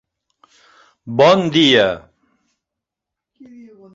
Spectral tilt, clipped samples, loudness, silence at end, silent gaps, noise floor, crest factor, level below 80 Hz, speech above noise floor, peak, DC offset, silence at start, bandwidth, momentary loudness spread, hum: -5 dB/octave; under 0.1%; -13 LUFS; 1.95 s; none; -84 dBFS; 18 dB; -56 dBFS; 71 dB; 0 dBFS; under 0.1%; 1.05 s; 7.8 kHz; 12 LU; none